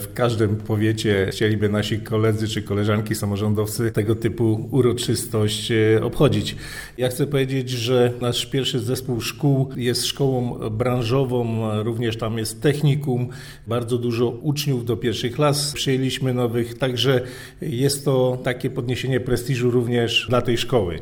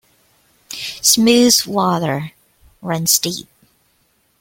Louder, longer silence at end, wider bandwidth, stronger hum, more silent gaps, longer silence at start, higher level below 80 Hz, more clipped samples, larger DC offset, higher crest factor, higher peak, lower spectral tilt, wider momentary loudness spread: second, -22 LUFS vs -15 LUFS; second, 0 s vs 1 s; first, over 20 kHz vs 17 kHz; neither; neither; second, 0 s vs 0.7 s; first, -46 dBFS vs -56 dBFS; neither; neither; about the same, 18 dB vs 18 dB; second, -4 dBFS vs 0 dBFS; first, -5.5 dB/octave vs -3 dB/octave; second, 6 LU vs 19 LU